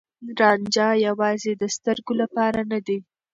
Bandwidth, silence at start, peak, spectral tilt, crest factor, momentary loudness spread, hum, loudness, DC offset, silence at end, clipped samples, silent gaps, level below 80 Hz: 7.8 kHz; 0.2 s; -6 dBFS; -4 dB/octave; 18 dB; 8 LU; none; -22 LUFS; under 0.1%; 0.3 s; under 0.1%; none; -62 dBFS